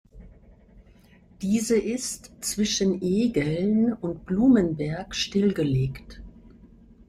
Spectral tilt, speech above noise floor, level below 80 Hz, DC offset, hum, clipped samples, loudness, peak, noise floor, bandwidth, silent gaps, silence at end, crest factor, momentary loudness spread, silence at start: -5.5 dB/octave; 30 dB; -50 dBFS; under 0.1%; none; under 0.1%; -25 LUFS; -8 dBFS; -54 dBFS; 15.5 kHz; none; 0.6 s; 16 dB; 11 LU; 0.15 s